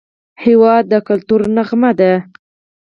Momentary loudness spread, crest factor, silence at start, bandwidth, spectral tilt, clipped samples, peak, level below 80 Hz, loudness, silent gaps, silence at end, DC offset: 5 LU; 12 dB; 0.4 s; 5.6 kHz; -9 dB/octave; under 0.1%; 0 dBFS; -54 dBFS; -12 LUFS; none; 0.65 s; under 0.1%